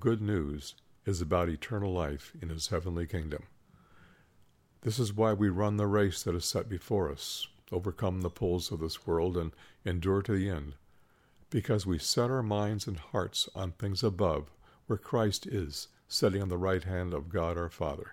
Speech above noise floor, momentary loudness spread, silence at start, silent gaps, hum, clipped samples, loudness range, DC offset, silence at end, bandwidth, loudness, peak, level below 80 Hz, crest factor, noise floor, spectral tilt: 33 dB; 9 LU; 0 s; none; none; under 0.1%; 4 LU; under 0.1%; 0 s; 16 kHz; -33 LUFS; -14 dBFS; -52 dBFS; 18 dB; -65 dBFS; -5.5 dB/octave